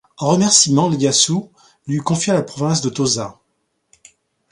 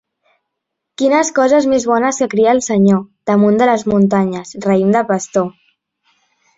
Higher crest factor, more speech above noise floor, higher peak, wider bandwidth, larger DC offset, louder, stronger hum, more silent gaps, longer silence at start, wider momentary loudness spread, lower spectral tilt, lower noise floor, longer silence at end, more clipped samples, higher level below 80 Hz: about the same, 18 dB vs 14 dB; second, 53 dB vs 64 dB; about the same, 0 dBFS vs -2 dBFS; first, 11.5 kHz vs 8 kHz; neither; about the same, -16 LUFS vs -14 LUFS; neither; neither; second, 0.2 s vs 1 s; first, 12 LU vs 6 LU; second, -4 dB/octave vs -6 dB/octave; second, -69 dBFS vs -77 dBFS; first, 1.2 s vs 1.05 s; neither; about the same, -56 dBFS vs -54 dBFS